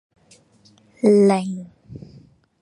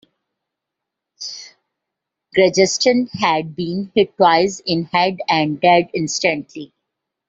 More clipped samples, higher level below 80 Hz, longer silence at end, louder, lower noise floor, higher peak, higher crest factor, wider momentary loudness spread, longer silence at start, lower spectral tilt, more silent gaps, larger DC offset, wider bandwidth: neither; about the same, -62 dBFS vs -60 dBFS; about the same, 0.65 s vs 0.65 s; about the same, -18 LUFS vs -17 LUFS; second, -55 dBFS vs -82 dBFS; second, -4 dBFS vs 0 dBFS; about the same, 18 dB vs 18 dB; first, 26 LU vs 16 LU; second, 1.05 s vs 1.2 s; first, -7.5 dB/octave vs -4 dB/octave; neither; neither; first, 11 kHz vs 7.8 kHz